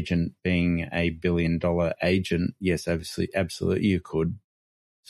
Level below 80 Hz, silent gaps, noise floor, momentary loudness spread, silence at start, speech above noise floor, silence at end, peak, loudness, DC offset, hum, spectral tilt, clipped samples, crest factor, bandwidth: -46 dBFS; none; under -90 dBFS; 5 LU; 0 s; over 65 dB; 0.7 s; -10 dBFS; -26 LUFS; under 0.1%; none; -6.5 dB/octave; under 0.1%; 16 dB; 12.5 kHz